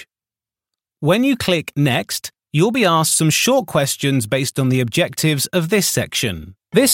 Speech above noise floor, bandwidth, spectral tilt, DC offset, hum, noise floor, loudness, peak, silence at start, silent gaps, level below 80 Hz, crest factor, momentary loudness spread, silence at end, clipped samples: over 73 dB; 17 kHz; -4 dB/octave; under 0.1%; none; under -90 dBFS; -17 LUFS; -2 dBFS; 0 s; none; -52 dBFS; 16 dB; 7 LU; 0 s; under 0.1%